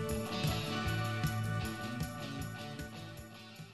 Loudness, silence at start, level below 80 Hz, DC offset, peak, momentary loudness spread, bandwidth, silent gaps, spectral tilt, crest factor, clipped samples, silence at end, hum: -38 LUFS; 0 s; -52 dBFS; under 0.1%; -22 dBFS; 13 LU; 14 kHz; none; -5 dB/octave; 16 dB; under 0.1%; 0 s; none